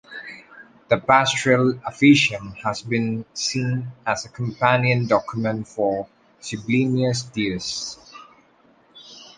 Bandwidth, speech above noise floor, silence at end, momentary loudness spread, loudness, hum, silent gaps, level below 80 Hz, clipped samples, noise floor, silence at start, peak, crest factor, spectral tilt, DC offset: 9.8 kHz; 36 dB; 0.1 s; 17 LU; -21 LUFS; none; none; -56 dBFS; under 0.1%; -57 dBFS; 0.1 s; -2 dBFS; 20 dB; -5 dB/octave; under 0.1%